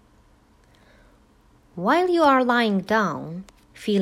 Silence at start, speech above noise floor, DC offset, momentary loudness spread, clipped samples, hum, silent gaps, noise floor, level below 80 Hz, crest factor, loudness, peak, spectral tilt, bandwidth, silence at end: 1.75 s; 36 dB; under 0.1%; 18 LU; under 0.1%; none; none; -57 dBFS; -58 dBFS; 18 dB; -21 LUFS; -6 dBFS; -6 dB/octave; 15.5 kHz; 0 s